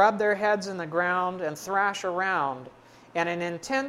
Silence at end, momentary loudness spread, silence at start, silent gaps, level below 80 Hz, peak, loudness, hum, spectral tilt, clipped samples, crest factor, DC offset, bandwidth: 0 s; 7 LU; 0 s; none; -70 dBFS; -6 dBFS; -27 LUFS; none; -4.5 dB/octave; under 0.1%; 20 dB; under 0.1%; 16 kHz